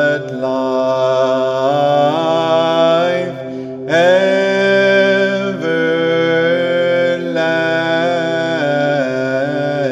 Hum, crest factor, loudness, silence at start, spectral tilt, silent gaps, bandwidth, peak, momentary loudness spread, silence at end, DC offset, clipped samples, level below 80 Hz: none; 12 dB; -14 LUFS; 0 s; -5.5 dB/octave; none; 9.2 kHz; -2 dBFS; 6 LU; 0 s; under 0.1%; under 0.1%; -64 dBFS